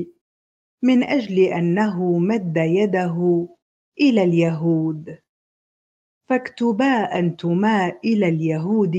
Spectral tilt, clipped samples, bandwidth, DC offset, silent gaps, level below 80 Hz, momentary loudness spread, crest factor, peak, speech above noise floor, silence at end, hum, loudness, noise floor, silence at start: -8 dB/octave; under 0.1%; 7.8 kHz; under 0.1%; 0.21-0.78 s, 3.62-3.92 s, 5.29-6.21 s; -66 dBFS; 6 LU; 16 dB; -4 dBFS; over 71 dB; 0 s; none; -20 LUFS; under -90 dBFS; 0 s